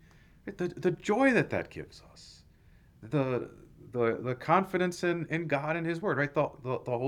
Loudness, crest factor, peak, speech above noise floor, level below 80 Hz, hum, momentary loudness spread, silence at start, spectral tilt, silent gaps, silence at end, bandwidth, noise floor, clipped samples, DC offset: -30 LUFS; 20 dB; -10 dBFS; 29 dB; -62 dBFS; none; 18 LU; 0.45 s; -6.5 dB/octave; none; 0 s; 14.5 kHz; -59 dBFS; under 0.1%; under 0.1%